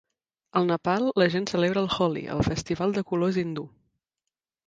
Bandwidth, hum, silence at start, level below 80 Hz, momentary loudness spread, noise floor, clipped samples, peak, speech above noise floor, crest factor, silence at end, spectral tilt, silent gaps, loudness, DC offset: 9 kHz; none; 0.55 s; -50 dBFS; 6 LU; -87 dBFS; under 0.1%; -8 dBFS; 62 dB; 20 dB; 1 s; -6 dB/octave; none; -26 LUFS; under 0.1%